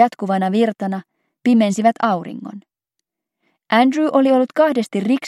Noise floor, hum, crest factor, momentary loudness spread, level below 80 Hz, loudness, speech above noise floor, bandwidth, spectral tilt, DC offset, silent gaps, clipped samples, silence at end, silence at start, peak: -80 dBFS; none; 18 dB; 12 LU; -76 dBFS; -17 LUFS; 63 dB; 13 kHz; -6 dB/octave; under 0.1%; none; under 0.1%; 0 s; 0 s; 0 dBFS